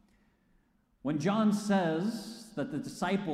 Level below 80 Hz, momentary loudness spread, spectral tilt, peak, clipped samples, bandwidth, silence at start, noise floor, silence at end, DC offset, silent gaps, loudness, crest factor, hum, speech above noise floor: -66 dBFS; 12 LU; -6 dB/octave; -18 dBFS; under 0.1%; 14 kHz; 1.05 s; -70 dBFS; 0 s; under 0.1%; none; -32 LUFS; 14 dB; none; 39 dB